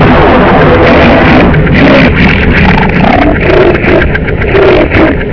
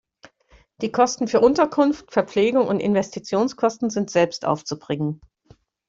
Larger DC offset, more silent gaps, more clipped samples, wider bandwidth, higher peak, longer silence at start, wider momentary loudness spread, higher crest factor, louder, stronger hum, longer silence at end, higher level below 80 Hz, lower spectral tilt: first, 3% vs under 0.1%; neither; first, 10% vs under 0.1%; second, 5.4 kHz vs 7.8 kHz; first, 0 dBFS vs -4 dBFS; second, 0 s vs 0.8 s; second, 3 LU vs 9 LU; second, 4 dB vs 18 dB; first, -4 LUFS vs -21 LUFS; neither; second, 0 s vs 0.75 s; first, -14 dBFS vs -58 dBFS; first, -8 dB/octave vs -5.5 dB/octave